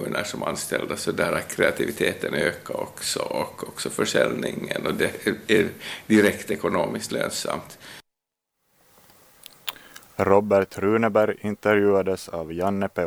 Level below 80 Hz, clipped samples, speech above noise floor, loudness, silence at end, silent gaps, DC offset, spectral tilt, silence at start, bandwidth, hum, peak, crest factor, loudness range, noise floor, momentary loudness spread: -58 dBFS; under 0.1%; 59 dB; -24 LUFS; 0 s; none; under 0.1%; -4.5 dB/octave; 0 s; over 20 kHz; none; -2 dBFS; 22 dB; 7 LU; -83 dBFS; 12 LU